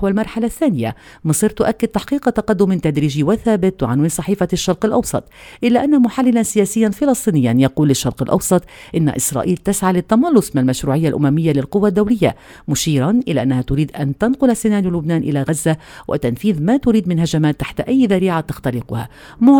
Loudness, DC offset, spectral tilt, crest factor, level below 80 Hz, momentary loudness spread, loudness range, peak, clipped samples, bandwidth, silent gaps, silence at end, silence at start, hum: -16 LUFS; under 0.1%; -6 dB/octave; 16 dB; -40 dBFS; 7 LU; 2 LU; 0 dBFS; under 0.1%; 19 kHz; none; 0 s; 0 s; none